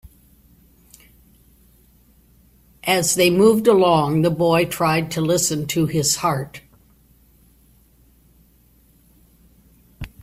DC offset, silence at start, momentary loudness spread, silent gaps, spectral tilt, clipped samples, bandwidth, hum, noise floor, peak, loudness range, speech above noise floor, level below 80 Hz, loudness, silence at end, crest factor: under 0.1%; 2.85 s; 13 LU; none; -4.5 dB/octave; under 0.1%; 16 kHz; none; -55 dBFS; -2 dBFS; 9 LU; 38 dB; -50 dBFS; -18 LUFS; 0.15 s; 20 dB